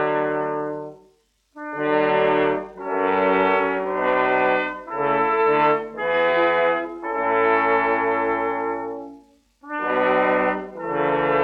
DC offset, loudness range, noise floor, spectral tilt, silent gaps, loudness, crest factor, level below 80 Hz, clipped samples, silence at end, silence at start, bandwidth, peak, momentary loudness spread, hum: under 0.1%; 3 LU; -61 dBFS; -7 dB/octave; none; -21 LUFS; 16 dB; -56 dBFS; under 0.1%; 0 s; 0 s; 5.6 kHz; -6 dBFS; 10 LU; none